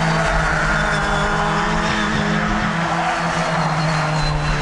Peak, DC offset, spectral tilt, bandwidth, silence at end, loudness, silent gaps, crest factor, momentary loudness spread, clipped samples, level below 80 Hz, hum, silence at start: -4 dBFS; under 0.1%; -5 dB/octave; 11.5 kHz; 0 s; -18 LUFS; none; 14 dB; 2 LU; under 0.1%; -28 dBFS; none; 0 s